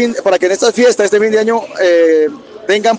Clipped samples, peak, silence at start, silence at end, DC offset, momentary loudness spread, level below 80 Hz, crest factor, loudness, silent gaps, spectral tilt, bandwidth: under 0.1%; 0 dBFS; 0 s; 0 s; under 0.1%; 6 LU; -62 dBFS; 10 dB; -11 LUFS; none; -3 dB/octave; 9.8 kHz